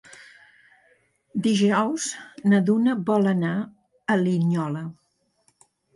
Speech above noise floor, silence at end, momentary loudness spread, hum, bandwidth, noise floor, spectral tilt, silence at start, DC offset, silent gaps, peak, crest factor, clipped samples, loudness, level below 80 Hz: 45 dB; 1.05 s; 13 LU; none; 11.5 kHz; -67 dBFS; -6 dB/octave; 1.35 s; under 0.1%; none; -10 dBFS; 16 dB; under 0.1%; -23 LUFS; -70 dBFS